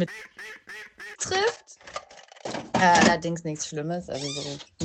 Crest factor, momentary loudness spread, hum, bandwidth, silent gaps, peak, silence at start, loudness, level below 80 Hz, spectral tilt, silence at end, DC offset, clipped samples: 22 dB; 21 LU; none; 12 kHz; none; -6 dBFS; 0 s; -25 LUFS; -58 dBFS; -3.5 dB/octave; 0 s; under 0.1%; under 0.1%